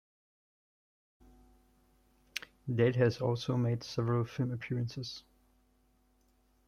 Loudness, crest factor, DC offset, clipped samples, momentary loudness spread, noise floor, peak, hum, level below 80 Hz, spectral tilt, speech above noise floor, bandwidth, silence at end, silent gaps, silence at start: -34 LUFS; 22 dB; under 0.1%; under 0.1%; 14 LU; -71 dBFS; -14 dBFS; none; -66 dBFS; -7 dB/octave; 39 dB; 9.4 kHz; 1.5 s; none; 2.35 s